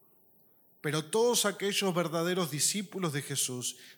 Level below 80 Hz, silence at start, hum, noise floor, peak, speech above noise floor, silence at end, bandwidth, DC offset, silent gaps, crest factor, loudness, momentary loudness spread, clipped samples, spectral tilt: -88 dBFS; 0.85 s; none; -64 dBFS; -14 dBFS; 33 dB; 0.05 s; 19 kHz; under 0.1%; none; 18 dB; -30 LUFS; 7 LU; under 0.1%; -3 dB/octave